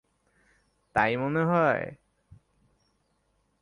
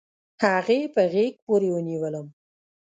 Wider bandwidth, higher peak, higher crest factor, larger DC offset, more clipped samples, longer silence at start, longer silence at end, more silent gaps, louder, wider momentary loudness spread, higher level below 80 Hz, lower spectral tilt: first, 10.5 kHz vs 9.2 kHz; about the same, -8 dBFS vs -6 dBFS; about the same, 22 dB vs 18 dB; neither; neither; first, 0.95 s vs 0.4 s; first, 1.7 s vs 0.6 s; second, none vs 1.42-1.47 s; about the same, -26 LUFS vs -24 LUFS; about the same, 8 LU vs 8 LU; first, -62 dBFS vs -74 dBFS; first, -8 dB/octave vs -6.5 dB/octave